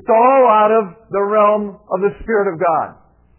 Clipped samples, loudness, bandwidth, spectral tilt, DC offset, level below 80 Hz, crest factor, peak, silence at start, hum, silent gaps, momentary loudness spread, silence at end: under 0.1%; -15 LUFS; 3.2 kHz; -10 dB/octave; under 0.1%; -48 dBFS; 12 dB; -2 dBFS; 0.1 s; none; none; 11 LU; 0.45 s